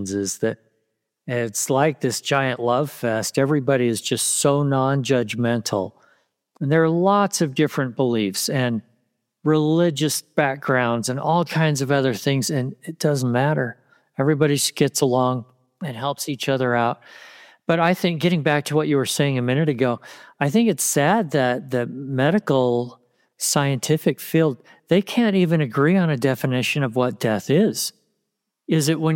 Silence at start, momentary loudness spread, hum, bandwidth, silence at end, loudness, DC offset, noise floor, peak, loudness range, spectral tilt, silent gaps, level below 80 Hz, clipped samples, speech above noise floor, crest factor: 0 s; 8 LU; none; 17 kHz; 0 s; -21 LUFS; under 0.1%; -78 dBFS; -4 dBFS; 2 LU; -5 dB/octave; none; -68 dBFS; under 0.1%; 58 dB; 16 dB